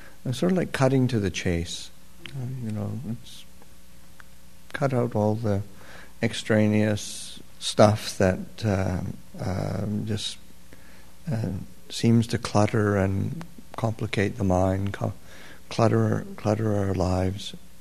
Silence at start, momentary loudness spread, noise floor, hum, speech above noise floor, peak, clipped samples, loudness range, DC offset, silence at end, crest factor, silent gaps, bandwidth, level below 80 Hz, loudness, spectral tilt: 0 s; 17 LU; -52 dBFS; none; 27 dB; 0 dBFS; under 0.1%; 6 LU; 1%; 0.2 s; 26 dB; none; 13.5 kHz; -52 dBFS; -26 LUFS; -6 dB/octave